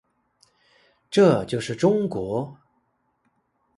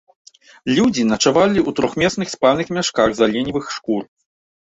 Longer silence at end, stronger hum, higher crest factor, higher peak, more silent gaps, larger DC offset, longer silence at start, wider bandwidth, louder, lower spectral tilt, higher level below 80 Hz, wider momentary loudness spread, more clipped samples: first, 1.25 s vs 0.75 s; neither; about the same, 20 dB vs 16 dB; about the same, -4 dBFS vs -2 dBFS; neither; neither; first, 1.1 s vs 0.65 s; first, 11.5 kHz vs 8.2 kHz; second, -22 LUFS vs -18 LUFS; first, -6.5 dB/octave vs -4.5 dB/octave; second, -60 dBFS vs -50 dBFS; first, 11 LU vs 8 LU; neither